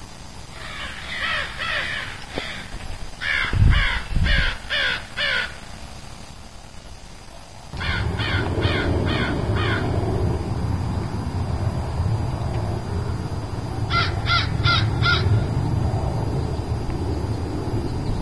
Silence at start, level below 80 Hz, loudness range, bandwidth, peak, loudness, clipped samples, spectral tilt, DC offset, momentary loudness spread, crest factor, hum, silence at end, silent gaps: 0 s; -30 dBFS; 6 LU; 11 kHz; -4 dBFS; -23 LUFS; under 0.1%; -5.5 dB/octave; 1%; 19 LU; 18 dB; none; 0 s; none